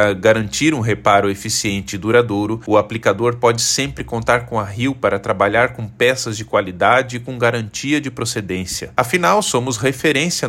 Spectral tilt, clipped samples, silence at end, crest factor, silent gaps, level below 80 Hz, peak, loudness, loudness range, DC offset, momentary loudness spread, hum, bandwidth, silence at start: -4 dB/octave; under 0.1%; 0 s; 16 dB; none; -46 dBFS; 0 dBFS; -17 LUFS; 2 LU; under 0.1%; 8 LU; none; 16.5 kHz; 0 s